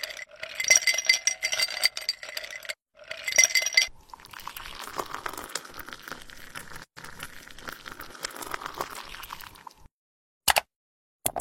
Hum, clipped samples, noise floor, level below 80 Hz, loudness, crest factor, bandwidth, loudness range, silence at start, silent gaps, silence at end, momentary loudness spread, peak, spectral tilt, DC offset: none; under 0.1%; -50 dBFS; -56 dBFS; -25 LUFS; 30 dB; 16.5 kHz; 15 LU; 0 s; 9.91-10.41 s, 10.76-11.20 s; 0 s; 22 LU; 0 dBFS; 1.5 dB/octave; under 0.1%